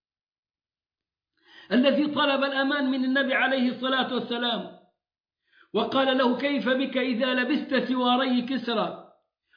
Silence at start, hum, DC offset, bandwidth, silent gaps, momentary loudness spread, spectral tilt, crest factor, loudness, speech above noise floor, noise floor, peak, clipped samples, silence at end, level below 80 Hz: 1.6 s; none; under 0.1%; 5.2 kHz; 5.20-5.24 s; 6 LU; -6.5 dB/octave; 16 dB; -25 LUFS; over 65 dB; under -90 dBFS; -10 dBFS; under 0.1%; 0.55 s; -76 dBFS